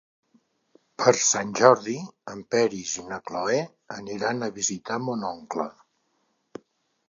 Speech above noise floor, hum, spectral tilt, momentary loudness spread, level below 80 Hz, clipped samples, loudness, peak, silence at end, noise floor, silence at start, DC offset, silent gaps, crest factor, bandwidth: 47 dB; none; -3 dB/octave; 20 LU; -70 dBFS; under 0.1%; -25 LUFS; -2 dBFS; 1.4 s; -72 dBFS; 1 s; under 0.1%; none; 26 dB; 7.6 kHz